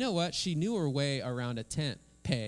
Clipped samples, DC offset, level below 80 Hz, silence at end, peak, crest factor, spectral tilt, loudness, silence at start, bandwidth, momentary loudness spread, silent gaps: under 0.1%; under 0.1%; -58 dBFS; 0 s; -16 dBFS; 18 dB; -5 dB/octave; -33 LUFS; 0 s; 12 kHz; 5 LU; none